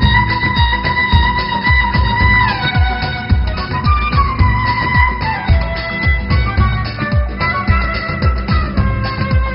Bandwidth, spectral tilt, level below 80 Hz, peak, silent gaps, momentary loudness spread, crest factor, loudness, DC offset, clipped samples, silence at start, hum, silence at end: 5.6 kHz; -4 dB/octave; -18 dBFS; 0 dBFS; none; 5 LU; 14 dB; -14 LUFS; under 0.1%; under 0.1%; 0 s; none; 0 s